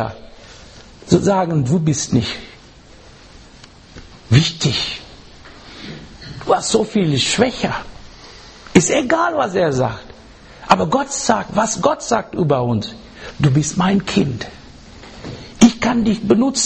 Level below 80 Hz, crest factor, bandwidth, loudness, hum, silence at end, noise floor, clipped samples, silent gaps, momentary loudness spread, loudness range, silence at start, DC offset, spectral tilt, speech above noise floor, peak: -42 dBFS; 18 dB; 8.8 kHz; -17 LUFS; none; 0 s; -43 dBFS; under 0.1%; none; 20 LU; 4 LU; 0 s; under 0.1%; -5 dB/octave; 26 dB; 0 dBFS